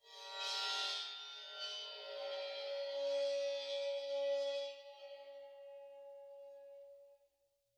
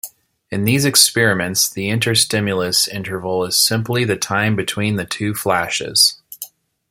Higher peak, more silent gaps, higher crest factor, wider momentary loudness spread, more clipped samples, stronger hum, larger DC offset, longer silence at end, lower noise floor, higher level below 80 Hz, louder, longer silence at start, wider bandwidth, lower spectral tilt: second, -28 dBFS vs 0 dBFS; neither; about the same, 16 dB vs 18 dB; first, 18 LU vs 11 LU; neither; neither; neither; first, 0.6 s vs 0.45 s; first, -82 dBFS vs -38 dBFS; second, under -90 dBFS vs -54 dBFS; second, -41 LUFS vs -16 LUFS; about the same, 0.05 s vs 0.05 s; second, 12.5 kHz vs 16.5 kHz; second, 2.5 dB/octave vs -3 dB/octave